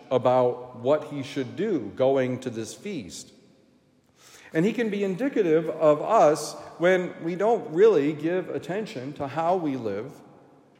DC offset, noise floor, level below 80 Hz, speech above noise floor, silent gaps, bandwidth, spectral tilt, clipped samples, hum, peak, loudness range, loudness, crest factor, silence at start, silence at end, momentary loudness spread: under 0.1%; -62 dBFS; -74 dBFS; 37 dB; none; 15.5 kHz; -6 dB/octave; under 0.1%; none; -8 dBFS; 7 LU; -25 LUFS; 18 dB; 0 s; 0.6 s; 15 LU